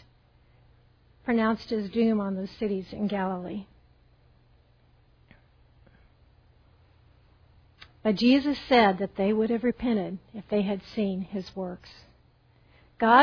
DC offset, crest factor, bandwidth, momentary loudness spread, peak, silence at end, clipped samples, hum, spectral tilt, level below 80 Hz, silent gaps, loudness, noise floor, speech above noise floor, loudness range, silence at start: under 0.1%; 24 dB; 5.4 kHz; 15 LU; -4 dBFS; 0 s; under 0.1%; none; -7.5 dB/octave; -58 dBFS; none; -27 LUFS; -61 dBFS; 34 dB; 12 LU; 1.25 s